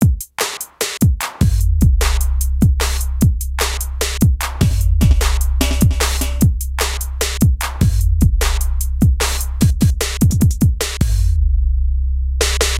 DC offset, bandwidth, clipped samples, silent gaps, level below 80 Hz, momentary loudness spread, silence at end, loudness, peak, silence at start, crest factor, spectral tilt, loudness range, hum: under 0.1%; 17 kHz; under 0.1%; none; -18 dBFS; 6 LU; 0 s; -17 LUFS; 0 dBFS; 0 s; 14 dB; -5 dB/octave; 1 LU; none